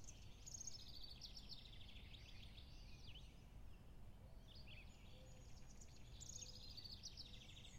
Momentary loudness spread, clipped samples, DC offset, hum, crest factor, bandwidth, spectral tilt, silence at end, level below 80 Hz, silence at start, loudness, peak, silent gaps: 10 LU; under 0.1%; under 0.1%; none; 18 dB; 16 kHz; -2.5 dB/octave; 0 s; -62 dBFS; 0 s; -59 LUFS; -40 dBFS; none